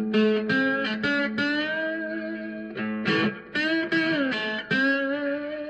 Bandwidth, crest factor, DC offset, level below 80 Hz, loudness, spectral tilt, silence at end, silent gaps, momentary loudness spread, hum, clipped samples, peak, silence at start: 8.4 kHz; 14 dB; under 0.1%; -66 dBFS; -25 LUFS; -6 dB/octave; 0 s; none; 9 LU; none; under 0.1%; -12 dBFS; 0 s